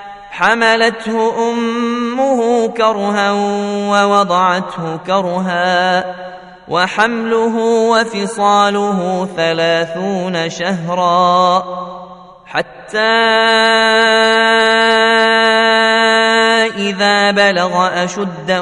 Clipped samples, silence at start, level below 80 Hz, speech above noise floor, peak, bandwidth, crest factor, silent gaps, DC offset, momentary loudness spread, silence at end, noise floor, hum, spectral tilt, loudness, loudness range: under 0.1%; 0 s; -56 dBFS; 22 dB; 0 dBFS; 11 kHz; 14 dB; none; under 0.1%; 9 LU; 0 s; -35 dBFS; none; -4 dB/octave; -13 LUFS; 5 LU